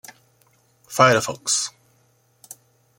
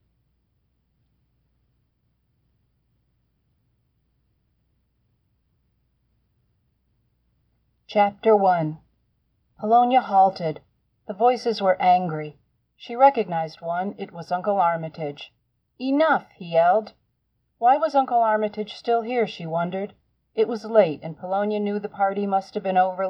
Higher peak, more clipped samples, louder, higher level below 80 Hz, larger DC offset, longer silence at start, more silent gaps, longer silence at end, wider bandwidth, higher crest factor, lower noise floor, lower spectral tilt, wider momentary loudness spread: about the same, -2 dBFS vs -4 dBFS; neither; first, -19 LUFS vs -22 LUFS; first, -64 dBFS vs -72 dBFS; neither; second, 0.9 s vs 7.9 s; neither; first, 1.3 s vs 0 s; first, 17 kHz vs 6.6 kHz; about the same, 22 dB vs 20 dB; second, -61 dBFS vs -72 dBFS; second, -2.5 dB/octave vs -7 dB/octave; first, 27 LU vs 14 LU